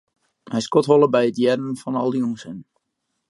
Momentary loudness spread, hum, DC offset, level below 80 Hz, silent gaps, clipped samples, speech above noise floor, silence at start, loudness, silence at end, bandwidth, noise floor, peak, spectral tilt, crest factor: 16 LU; none; under 0.1%; -70 dBFS; none; under 0.1%; 57 dB; 0.5 s; -20 LUFS; 0.65 s; 11.5 kHz; -76 dBFS; -2 dBFS; -6 dB/octave; 18 dB